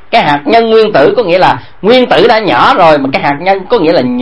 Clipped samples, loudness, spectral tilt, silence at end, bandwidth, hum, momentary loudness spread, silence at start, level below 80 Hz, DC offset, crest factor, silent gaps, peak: 2%; -7 LUFS; -6.5 dB/octave; 0 s; 11 kHz; none; 5 LU; 0.1 s; -40 dBFS; 3%; 8 dB; none; 0 dBFS